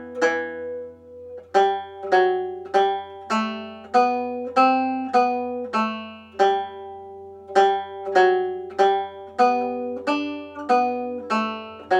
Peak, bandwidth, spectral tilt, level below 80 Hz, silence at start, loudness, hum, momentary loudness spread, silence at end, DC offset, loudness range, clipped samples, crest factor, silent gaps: -4 dBFS; 9 kHz; -4.5 dB/octave; -72 dBFS; 0 s; -22 LUFS; none; 15 LU; 0 s; under 0.1%; 2 LU; under 0.1%; 18 dB; none